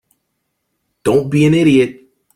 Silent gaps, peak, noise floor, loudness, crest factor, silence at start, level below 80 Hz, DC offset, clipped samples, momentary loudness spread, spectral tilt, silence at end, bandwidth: none; 0 dBFS; -71 dBFS; -13 LUFS; 14 dB; 1.05 s; -50 dBFS; under 0.1%; under 0.1%; 9 LU; -7 dB/octave; 0.45 s; 15.5 kHz